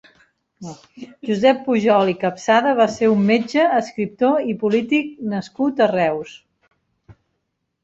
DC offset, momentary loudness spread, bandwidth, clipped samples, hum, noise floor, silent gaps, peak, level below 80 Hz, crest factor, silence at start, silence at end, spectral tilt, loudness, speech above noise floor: under 0.1%; 17 LU; 8 kHz; under 0.1%; none; -74 dBFS; none; -2 dBFS; -62 dBFS; 18 dB; 0.6 s; 0.7 s; -6 dB/octave; -18 LUFS; 56 dB